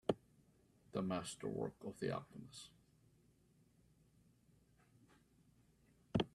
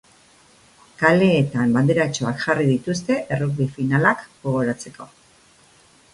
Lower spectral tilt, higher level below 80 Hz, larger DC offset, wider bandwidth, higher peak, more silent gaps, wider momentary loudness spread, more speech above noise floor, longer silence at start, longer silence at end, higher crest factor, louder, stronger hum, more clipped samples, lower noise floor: about the same, -5.5 dB/octave vs -6.5 dB/octave; second, -72 dBFS vs -56 dBFS; neither; first, 13 kHz vs 11.5 kHz; second, -20 dBFS vs 0 dBFS; neither; first, 14 LU vs 9 LU; second, 28 dB vs 34 dB; second, 0.1 s vs 1 s; second, 0.05 s vs 1.1 s; first, 28 dB vs 20 dB; second, -45 LUFS vs -20 LUFS; neither; neither; first, -73 dBFS vs -54 dBFS